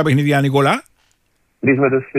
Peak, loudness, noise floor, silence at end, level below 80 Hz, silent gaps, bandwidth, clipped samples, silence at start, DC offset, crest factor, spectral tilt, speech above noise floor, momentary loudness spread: -2 dBFS; -16 LUFS; -63 dBFS; 0 s; -56 dBFS; none; 15 kHz; under 0.1%; 0 s; under 0.1%; 14 dB; -7 dB/octave; 48 dB; 6 LU